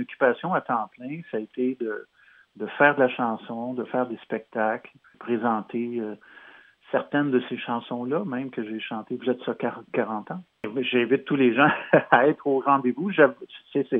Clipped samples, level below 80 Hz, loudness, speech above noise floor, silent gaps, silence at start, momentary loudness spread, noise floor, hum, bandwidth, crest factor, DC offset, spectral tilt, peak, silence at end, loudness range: under 0.1%; -80 dBFS; -25 LUFS; 27 dB; none; 0 s; 14 LU; -51 dBFS; none; 4 kHz; 24 dB; under 0.1%; -9 dB/octave; 0 dBFS; 0 s; 8 LU